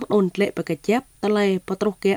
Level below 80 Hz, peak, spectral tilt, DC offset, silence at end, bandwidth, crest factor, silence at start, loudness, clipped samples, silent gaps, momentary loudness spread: -58 dBFS; -8 dBFS; -6.5 dB/octave; under 0.1%; 0 s; over 20 kHz; 14 dB; 0 s; -22 LUFS; under 0.1%; none; 4 LU